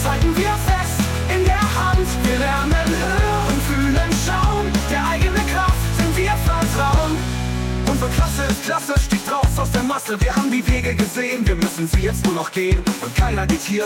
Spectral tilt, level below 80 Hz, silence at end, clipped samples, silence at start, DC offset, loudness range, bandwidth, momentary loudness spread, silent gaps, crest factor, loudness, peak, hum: -5 dB/octave; -24 dBFS; 0 s; under 0.1%; 0 s; under 0.1%; 1 LU; 17 kHz; 3 LU; none; 12 dB; -19 LUFS; -6 dBFS; none